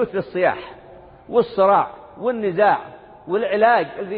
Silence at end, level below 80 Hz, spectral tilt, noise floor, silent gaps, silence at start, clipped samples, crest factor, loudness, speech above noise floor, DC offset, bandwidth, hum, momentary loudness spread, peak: 0 s; -58 dBFS; -10.5 dB/octave; -44 dBFS; none; 0 s; under 0.1%; 16 dB; -19 LUFS; 25 dB; under 0.1%; 5 kHz; none; 12 LU; -4 dBFS